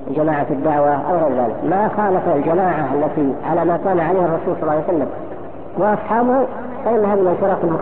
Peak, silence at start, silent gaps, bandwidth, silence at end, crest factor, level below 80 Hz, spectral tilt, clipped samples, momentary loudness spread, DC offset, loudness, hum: -6 dBFS; 0 s; none; 4 kHz; 0 s; 12 dB; -48 dBFS; -8 dB/octave; under 0.1%; 5 LU; 3%; -18 LUFS; none